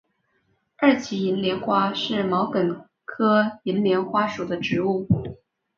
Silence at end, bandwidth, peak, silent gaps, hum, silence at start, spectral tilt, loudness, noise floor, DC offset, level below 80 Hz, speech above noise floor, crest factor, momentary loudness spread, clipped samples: 0.4 s; 7.2 kHz; -4 dBFS; none; none; 0.8 s; -6.5 dB/octave; -23 LUFS; -69 dBFS; under 0.1%; -54 dBFS; 47 dB; 18 dB; 6 LU; under 0.1%